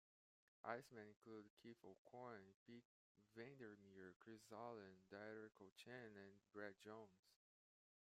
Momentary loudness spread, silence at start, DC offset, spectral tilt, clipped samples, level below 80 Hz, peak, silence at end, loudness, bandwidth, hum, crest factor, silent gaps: 10 LU; 0.65 s; under 0.1%; -5.5 dB/octave; under 0.1%; under -90 dBFS; -34 dBFS; 0.75 s; -61 LUFS; 14 kHz; none; 28 dB; 1.16-1.22 s, 1.50-1.57 s, 1.98-2.05 s, 2.54-2.66 s, 2.85-3.15 s, 4.16-4.20 s, 5.72-5.76 s, 7.19-7.23 s